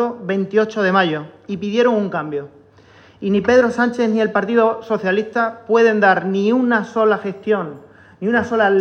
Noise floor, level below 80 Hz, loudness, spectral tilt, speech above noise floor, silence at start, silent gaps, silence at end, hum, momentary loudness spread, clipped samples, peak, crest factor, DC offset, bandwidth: -47 dBFS; -60 dBFS; -17 LUFS; -6.5 dB/octave; 30 dB; 0 s; none; 0 s; none; 10 LU; under 0.1%; -2 dBFS; 16 dB; under 0.1%; 8.4 kHz